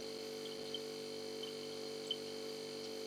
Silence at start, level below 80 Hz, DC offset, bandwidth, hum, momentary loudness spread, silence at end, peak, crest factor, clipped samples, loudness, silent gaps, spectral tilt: 0 s; -88 dBFS; under 0.1%; 19 kHz; 50 Hz at -75 dBFS; 3 LU; 0 s; -26 dBFS; 18 dB; under 0.1%; -44 LUFS; none; -2.5 dB/octave